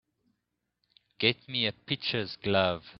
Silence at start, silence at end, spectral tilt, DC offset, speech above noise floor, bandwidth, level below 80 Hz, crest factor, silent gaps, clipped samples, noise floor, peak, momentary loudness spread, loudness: 1.2 s; 0.05 s; -2.5 dB/octave; under 0.1%; 52 dB; 6 kHz; -68 dBFS; 26 dB; none; under 0.1%; -83 dBFS; -6 dBFS; 5 LU; -29 LUFS